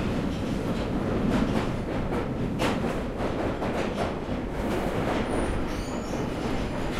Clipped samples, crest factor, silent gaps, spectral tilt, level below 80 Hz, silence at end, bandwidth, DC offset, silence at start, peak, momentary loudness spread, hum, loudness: under 0.1%; 16 dB; none; -6.5 dB/octave; -36 dBFS; 0 s; 15.5 kHz; under 0.1%; 0 s; -12 dBFS; 4 LU; none; -29 LUFS